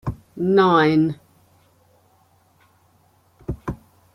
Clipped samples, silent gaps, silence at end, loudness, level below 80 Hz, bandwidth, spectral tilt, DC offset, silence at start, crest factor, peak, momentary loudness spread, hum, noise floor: under 0.1%; none; 0.4 s; -19 LUFS; -46 dBFS; 10.5 kHz; -8 dB/octave; under 0.1%; 0.05 s; 18 dB; -4 dBFS; 23 LU; none; -59 dBFS